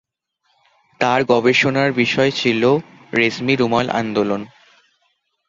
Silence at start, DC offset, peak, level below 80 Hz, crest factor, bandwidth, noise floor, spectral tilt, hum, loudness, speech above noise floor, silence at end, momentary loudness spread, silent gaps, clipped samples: 1 s; under 0.1%; -2 dBFS; -58 dBFS; 16 dB; 7.6 kHz; -68 dBFS; -5.5 dB/octave; none; -17 LUFS; 51 dB; 1 s; 7 LU; none; under 0.1%